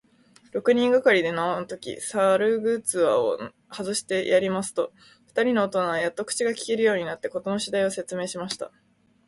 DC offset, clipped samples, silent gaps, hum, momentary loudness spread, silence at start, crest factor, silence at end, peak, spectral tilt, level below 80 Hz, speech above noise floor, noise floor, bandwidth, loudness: under 0.1%; under 0.1%; none; none; 12 LU; 0.55 s; 18 dB; 0.6 s; -8 dBFS; -3.5 dB/octave; -68 dBFS; 33 dB; -58 dBFS; 12 kHz; -25 LUFS